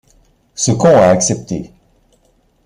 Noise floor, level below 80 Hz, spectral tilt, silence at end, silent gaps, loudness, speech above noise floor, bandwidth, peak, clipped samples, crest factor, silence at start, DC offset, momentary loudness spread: -56 dBFS; -46 dBFS; -5 dB/octave; 1 s; none; -12 LUFS; 44 dB; 12 kHz; 0 dBFS; under 0.1%; 14 dB; 0.55 s; under 0.1%; 16 LU